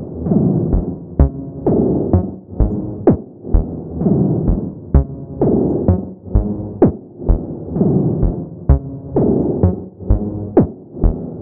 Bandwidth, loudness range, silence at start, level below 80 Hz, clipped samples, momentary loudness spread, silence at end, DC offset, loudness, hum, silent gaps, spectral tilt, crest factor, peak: 2.5 kHz; 1 LU; 0 s; -22 dBFS; under 0.1%; 6 LU; 0 s; under 0.1%; -18 LUFS; none; none; -15.5 dB/octave; 16 dB; 0 dBFS